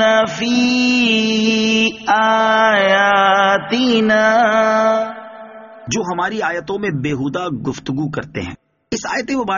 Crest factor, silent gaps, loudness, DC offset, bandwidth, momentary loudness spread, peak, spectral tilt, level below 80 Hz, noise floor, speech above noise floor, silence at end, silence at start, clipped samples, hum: 14 dB; none; -15 LUFS; under 0.1%; 7.4 kHz; 13 LU; -2 dBFS; -2.5 dB/octave; -52 dBFS; -36 dBFS; 19 dB; 0 s; 0 s; under 0.1%; none